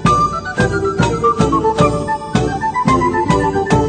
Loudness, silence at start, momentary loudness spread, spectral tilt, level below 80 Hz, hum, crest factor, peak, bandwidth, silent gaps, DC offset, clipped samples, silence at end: -15 LUFS; 0 s; 4 LU; -6 dB/octave; -30 dBFS; none; 14 dB; 0 dBFS; 9.4 kHz; none; under 0.1%; under 0.1%; 0 s